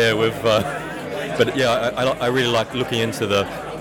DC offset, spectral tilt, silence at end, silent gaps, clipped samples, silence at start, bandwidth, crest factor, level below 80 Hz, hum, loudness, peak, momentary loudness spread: under 0.1%; -4.5 dB/octave; 0 s; none; under 0.1%; 0 s; 18 kHz; 14 dB; -48 dBFS; none; -20 LUFS; -6 dBFS; 9 LU